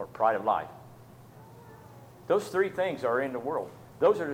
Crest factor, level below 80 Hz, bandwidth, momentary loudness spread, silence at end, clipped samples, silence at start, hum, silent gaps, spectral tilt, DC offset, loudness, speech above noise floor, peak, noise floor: 20 dB; -68 dBFS; 16.5 kHz; 24 LU; 0 s; under 0.1%; 0 s; none; none; -6 dB/octave; under 0.1%; -29 LUFS; 23 dB; -10 dBFS; -51 dBFS